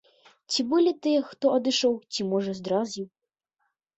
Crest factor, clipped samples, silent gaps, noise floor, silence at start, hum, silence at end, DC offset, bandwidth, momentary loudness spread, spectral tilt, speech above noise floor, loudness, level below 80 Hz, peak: 16 dB; under 0.1%; none; -81 dBFS; 0.5 s; none; 0.9 s; under 0.1%; 8.2 kHz; 7 LU; -4.5 dB/octave; 55 dB; -26 LUFS; -72 dBFS; -10 dBFS